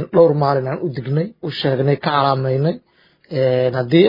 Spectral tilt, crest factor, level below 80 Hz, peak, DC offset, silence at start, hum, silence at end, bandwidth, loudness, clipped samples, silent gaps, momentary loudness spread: -9.5 dB/octave; 16 dB; -58 dBFS; 0 dBFS; under 0.1%; 0 s; none; 0 s; 5.4 kHz; -18 LUFS; under 0.1%; none; 10 LU